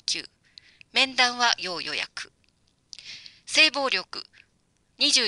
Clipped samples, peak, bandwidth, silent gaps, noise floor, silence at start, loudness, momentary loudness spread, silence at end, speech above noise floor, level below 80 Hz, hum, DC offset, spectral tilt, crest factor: under 0.1%; -4 dBFS; 11.5 kHz; none; -68 dBFS; 0.1 s; -23 LUFS; 22 LU; 0 s; 44 dB; -70 dBFS; none; under 0.1%; 0.5 dB/octave; 22 dB